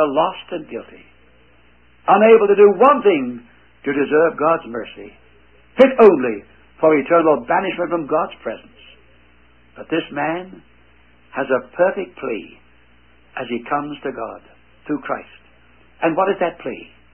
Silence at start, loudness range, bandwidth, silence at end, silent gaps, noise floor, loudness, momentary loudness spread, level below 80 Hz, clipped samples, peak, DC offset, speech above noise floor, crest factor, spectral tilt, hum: 0 s; 12 LU; 4.2 kHz; 0.3 s; none; -53 dBFS; -17 LUFS; 20 LU; -56 dBFS; under 0.1%; 0 dBFS; 0.2%; 36 dB; 18 dB; -8 dB/octave; 60 Hz at -50 dBFS